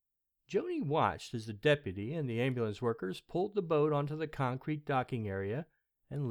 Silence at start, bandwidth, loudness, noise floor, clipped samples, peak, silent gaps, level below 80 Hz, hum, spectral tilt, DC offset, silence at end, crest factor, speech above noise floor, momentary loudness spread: 0.5 s; 13.5 kHz; -35 LUFS; -76 dBFS; under 0.1%; -16 dBFS; none; -66 dBFS; none; -7 dB/octave; under 0.1%; 0 s; 18 dB; 42 dB; 9 LU